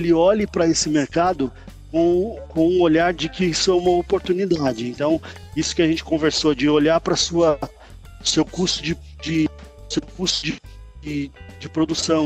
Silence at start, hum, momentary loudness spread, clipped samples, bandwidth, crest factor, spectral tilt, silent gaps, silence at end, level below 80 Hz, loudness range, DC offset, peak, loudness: 0 s; none; 11 LU; under 0.1%; 9.2 kHz; 14 dB; -4.5 dB/octave; none; 0 s; -42 dBFS; 4 LU; under 0.1%; -6 dBFS; -20 LUFS